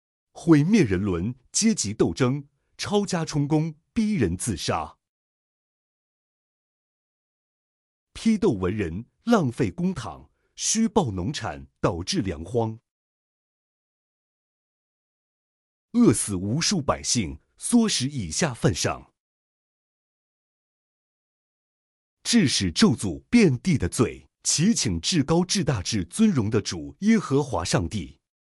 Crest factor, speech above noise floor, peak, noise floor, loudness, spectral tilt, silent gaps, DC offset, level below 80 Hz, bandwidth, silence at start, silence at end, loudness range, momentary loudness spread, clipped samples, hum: 20 dB; over 67 dB; -6 dBFS; under -90 dBFS; -24 LUFS; -4.5 dB/octave; 5.09-8.07 s, 12.91-15.89 s, 19.20-22.17 s; under 0.1%; -48 dBFS; 13.5 kHz; 0.35 s; 0.4 s; 9 LU; 10 LU; under 0.1%; none